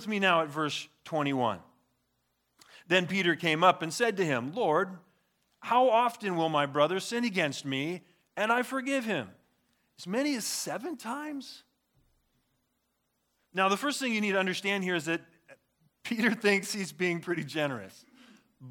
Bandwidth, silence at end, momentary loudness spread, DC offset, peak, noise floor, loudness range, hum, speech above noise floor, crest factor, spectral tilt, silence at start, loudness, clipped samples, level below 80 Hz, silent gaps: 19 kHz; 0 s; 12 LU; under 0.1%; -8 dBFS; -78 dBFS; 8 LU; none; 49 dB; 24 dB; -4 dB/octave; 0 s; -29 LUFS; under 0.1%; -82 dBFS; none